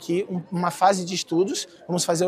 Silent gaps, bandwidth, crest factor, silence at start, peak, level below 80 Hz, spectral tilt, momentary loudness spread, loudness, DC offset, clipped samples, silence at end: none; 15.5 kHz; 18 dB; 0 s; -6 dBFS; -72 dBFS; -4.5 dB/octave; 8 LU; -24 LUFS; under 0.1%; under 0.1%; 0 s